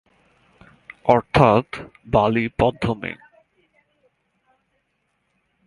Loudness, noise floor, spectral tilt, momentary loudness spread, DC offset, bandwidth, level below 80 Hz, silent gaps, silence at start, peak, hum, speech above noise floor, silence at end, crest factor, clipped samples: -19 LUFS; -71 dBFS; -7.5 dB/octave; 18 LU; under 0.1%; 11.5 kHz; -44 dBFS; none; 1.05 s; 0 dBFS; none; 52 dB; 2.5 s; 24 dB; under 0.1%